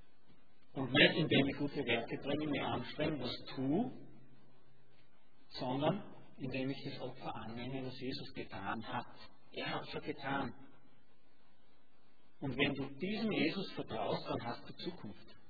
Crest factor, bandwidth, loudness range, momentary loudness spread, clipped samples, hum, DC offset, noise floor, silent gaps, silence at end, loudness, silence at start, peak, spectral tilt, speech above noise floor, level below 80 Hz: 26 dB; 5 kHz; 10 LU; 14 LU; under 0.1%; none; 0.4%; -72 dBFS; none; 0.15 s; -38 LUFS; 0.75 s; -14 dBFS; -3.5 dB/octave; 34 dB; -66 dBFS